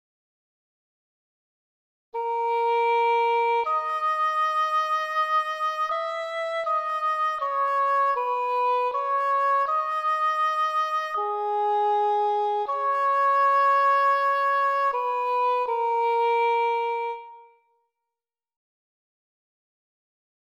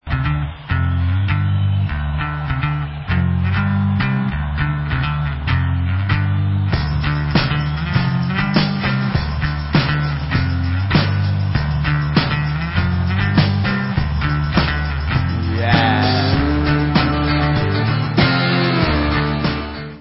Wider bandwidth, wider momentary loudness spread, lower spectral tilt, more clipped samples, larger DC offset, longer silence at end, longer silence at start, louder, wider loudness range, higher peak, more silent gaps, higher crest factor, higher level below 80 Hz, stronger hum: first, 14.5 kHz vs 5.8 kHz; about the same, 6 LU vs 5 LU; second, -1 dB/octave vs -10.5 dB/octave; neither; neither; first, 3.05 s vs 0 s; first, 2.15 s vs 0.05 s; second, -24 LUFS vs -18 LUFS; about the same, 5 LU vs 3 LU; second, -14 dBFS vs 0 dBFS; neither; about the same, 12 dB vs 16 dB; second, -78 dBFS vs -26 dBFS; neither